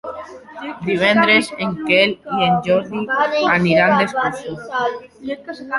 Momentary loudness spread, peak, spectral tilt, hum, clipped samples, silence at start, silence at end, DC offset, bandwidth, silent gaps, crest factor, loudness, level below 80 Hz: 17 LU; -2 dBFS; -5.5 dB/octave; none; under 0.1%; 0.05 s; 0 s; under 0.1%; 11.5 kHz; none; 16 dB; -16 LUFS; -54 dBFS